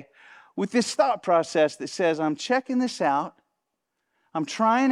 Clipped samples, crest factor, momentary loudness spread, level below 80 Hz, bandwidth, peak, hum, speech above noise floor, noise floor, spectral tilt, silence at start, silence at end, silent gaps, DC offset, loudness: under 0.1%; 18 dB; 11 LU; -78 dBFS; 12 kHz; -8 dBFS; none; 57 dB; -80 dBFS; -4.5 dB/octave; 0.55 s; 0 s; none; under 0.1%; -25 LUFS